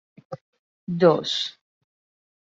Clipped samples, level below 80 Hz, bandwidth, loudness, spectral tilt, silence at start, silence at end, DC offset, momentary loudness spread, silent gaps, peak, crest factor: under 0.1%; -70 dBFS; 7.8 kHz; -22 LUFS; -5.5 dB/octave; 0.3 s; 0.9 s; under 0.1%; 23 LU; 0.41-0.53 s, 0.59-0.87 s; -4 dBFS; 22 dB